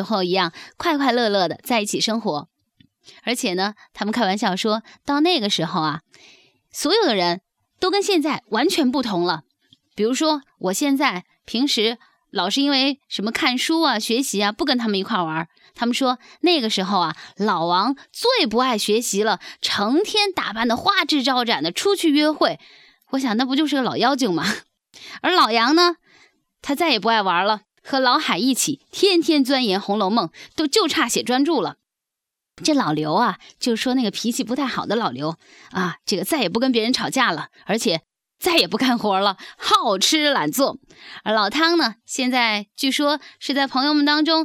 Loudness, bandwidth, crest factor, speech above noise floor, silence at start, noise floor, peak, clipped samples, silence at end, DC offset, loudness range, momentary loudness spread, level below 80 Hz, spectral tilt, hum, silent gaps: -20 LUFS; 17.5 kHz; 18 dB; 64 dB; 0 s; -85 dBFS; -2 dBFS; under 0.1%; 0 s; under 0.1%; 3 LU; 9 LU; -64 dBFS; -3 dB/octave; none; none